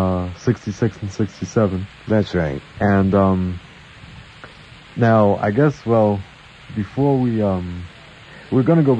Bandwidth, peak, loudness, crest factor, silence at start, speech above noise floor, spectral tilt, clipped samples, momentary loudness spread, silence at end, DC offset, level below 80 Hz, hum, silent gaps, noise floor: 8.6 kHz; -4 dBFS; -19 LUFS; 16 dB; 0 s; 24 dB; -8 dB/octave; under 0.1%; 24 LU; 0 s; under 0.1%; -46 dBFS; none; none; -42 dBFS